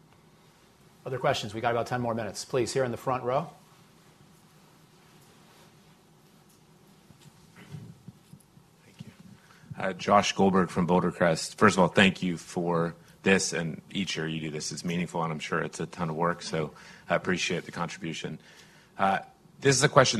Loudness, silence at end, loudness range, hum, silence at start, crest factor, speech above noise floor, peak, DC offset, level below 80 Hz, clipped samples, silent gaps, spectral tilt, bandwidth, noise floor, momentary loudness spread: -28 LUFS; 0 s; 9 LU; none; 1.05 s; 26 dB; 31 dB; -4 dBFS; under 0.1%; -60 dBFS; under 0.1%; none; -4.5 dB/octave; 14 kHz; -59 dBFS; 21 LU